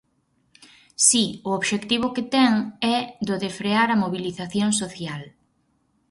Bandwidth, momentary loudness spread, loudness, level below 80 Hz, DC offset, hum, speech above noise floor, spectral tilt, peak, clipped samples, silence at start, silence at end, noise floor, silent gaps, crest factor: 11.5 kHz; 13 LU; -22 LUFS; -62 dBFS; under 0.1%; none; 45 dB; -3 dB/octave; -2 dBFS; under 0.1%; 1 s; 0.8 s; -68 dBFS; none; 22 dB